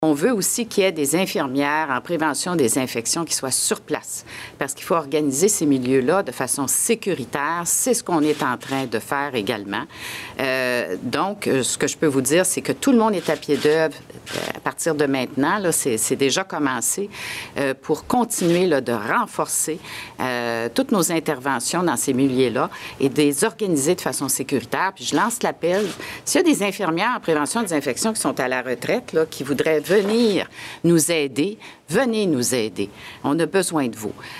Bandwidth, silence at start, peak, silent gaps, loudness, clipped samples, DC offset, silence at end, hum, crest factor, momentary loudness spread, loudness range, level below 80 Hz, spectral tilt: 16 kHz; 0 s; -4 dBFS; none; -21 LUFS; under 0.1%; under 0.1%; 0 s; none; 16 dB; 8 LU; 2 LU; -60 dBFS; -3.5 dB/octave